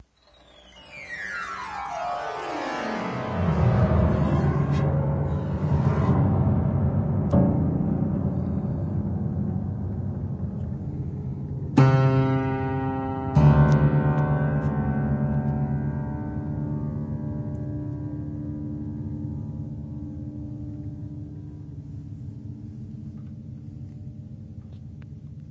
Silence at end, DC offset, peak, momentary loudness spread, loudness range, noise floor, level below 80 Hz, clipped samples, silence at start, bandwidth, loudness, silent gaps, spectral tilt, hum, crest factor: 0 s; under 0.1%; -4 dBFS; 18 LU; 15 LU; -56 dBFS; -36 dBFS; under 0.1%; 0.65 s; 7.6 kHz; -25 LUFS; none; -9 dB/octave; none; 20 dB